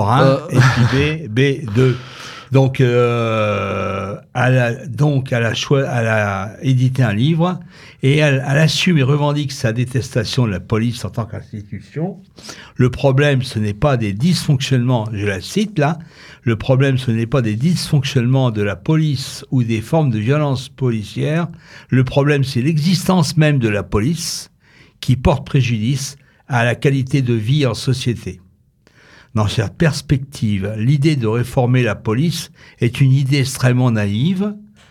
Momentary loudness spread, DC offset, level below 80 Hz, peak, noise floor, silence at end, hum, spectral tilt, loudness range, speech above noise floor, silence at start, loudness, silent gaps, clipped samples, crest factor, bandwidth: 10 LU; under 0.1%; -40 dBFS; 0 dBFS; -53 dBFS; 0.25 s; none; -6.5 dB/octave; 3 LU; 37 dB; 0 s; -17 LUFS; none; under 0.1%; 16 dB; 14 kHz